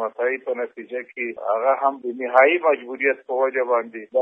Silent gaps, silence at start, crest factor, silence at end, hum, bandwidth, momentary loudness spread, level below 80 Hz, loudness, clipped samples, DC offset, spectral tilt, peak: none; 0 s; 20 dB; 0 s; none; 3.7 kHz; 12 LU; -80 dBFS; -21 LUFS; under 0.1%; under 0.1%; -6 dB/octave; -2 dBFS